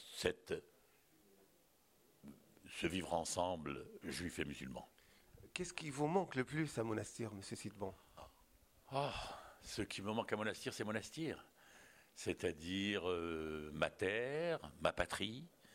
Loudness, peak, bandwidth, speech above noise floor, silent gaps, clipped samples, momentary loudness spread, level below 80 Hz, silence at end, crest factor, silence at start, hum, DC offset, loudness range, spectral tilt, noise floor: -43 LUFS; -20 dBFS; 16 kHz; 31 dB; none; under 0.1%; 20 LU; -68 dBFS; 0 s; 24 dB; 0 s; none; under 0.1%; 5 LU; -4.5 dB/octave; -73 dBFS